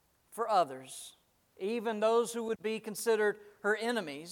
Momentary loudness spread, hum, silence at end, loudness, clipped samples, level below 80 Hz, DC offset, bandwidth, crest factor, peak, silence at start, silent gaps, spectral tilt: 15 LU; none; 0 s; -33 LUFS; under 0.1%; -82 dBFS; under 0.1%; 17.5 kHz; 18 dB; -16 dBFS; 0.3 s; none; -3.5 dB/octave